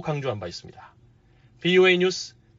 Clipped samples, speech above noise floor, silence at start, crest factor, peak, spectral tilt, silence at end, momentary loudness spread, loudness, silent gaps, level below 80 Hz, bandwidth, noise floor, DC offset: under 0.1%; 33 dB; 0 s; 18 dB; -6 dBFS; -3.5 dB/octave; 0.3 s; 18 LU; -22 LUFS; none; -62 dBFS; 7.6 kHz; -57 dBFS; under 0.1%